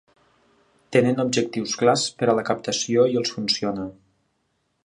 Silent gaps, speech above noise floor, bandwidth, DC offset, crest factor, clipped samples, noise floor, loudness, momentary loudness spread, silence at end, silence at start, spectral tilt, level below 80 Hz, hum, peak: none; 50 dB; 11 kHz; under 0.1%; 20 dB; under 0.1%; -72 dBFS; -22 LUFS; 6 LU; 0.95 s; 0.9 s; -4 dB/octave; -64 dBFS; none; -4 dBFS